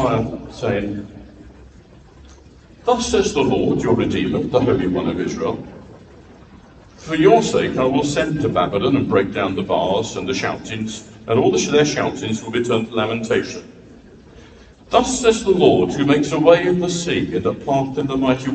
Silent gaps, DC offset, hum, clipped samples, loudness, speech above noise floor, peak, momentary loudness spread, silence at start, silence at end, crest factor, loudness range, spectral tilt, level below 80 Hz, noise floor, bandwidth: none; under 0.1%; none; under 0.1%; -18 LUFS; 27 dB; 0 dBFS; 11 LU; 0 s; 0 s; 18 dB; 5 LU; -5 dB/octave; -44 dBFS; -45 dBFS; 9.2 kHz